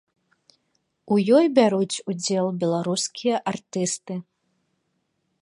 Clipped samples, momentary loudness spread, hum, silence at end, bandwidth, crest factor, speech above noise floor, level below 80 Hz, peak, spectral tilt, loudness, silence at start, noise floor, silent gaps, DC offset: under 0.1%; 11 LU; none; 1.2 s; 11.5 kHz; 20 dB; 52 dB; -74 dBFS; -4 dBFS; -5 dB/octave; -22 LUFS; 1.05 s; -74 dBFS; none; under 0.1%